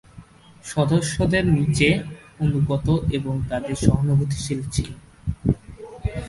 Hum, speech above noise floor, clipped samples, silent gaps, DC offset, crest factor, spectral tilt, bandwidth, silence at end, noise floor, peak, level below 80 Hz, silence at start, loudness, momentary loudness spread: none; 25 dB; under 0.1%; none; under 0.1%; 22 dB; -6 dB/octave; 11.5 kHz; 0 s; -46 dBFS; 0 dBFS; -36 dBFS; 0.15 s; -22 LUFS; 13 LU